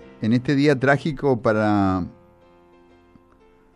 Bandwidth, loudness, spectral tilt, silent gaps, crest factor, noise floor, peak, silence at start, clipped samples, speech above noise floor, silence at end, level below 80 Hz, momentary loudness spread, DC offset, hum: 11 kHz; -20 LUFS; -7.5 dB/octave; none; 18 dB; -54 dBFS; -4 dBFS; 0.2 s; under 0.1%; 35 dB; 1.65 s; -52 dBFS; 5 LU; under 0.1%; none